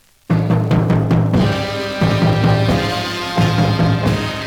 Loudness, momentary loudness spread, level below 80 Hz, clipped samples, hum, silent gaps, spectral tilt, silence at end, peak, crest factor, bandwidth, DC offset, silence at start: -16 LUFS; 5 LU; -34 dBFS; under 0.1%; none; none; -7 dB/octave; 0 s; -2 dBFS; 12 dB; 16 kHz; under 0.1%; 0.3 s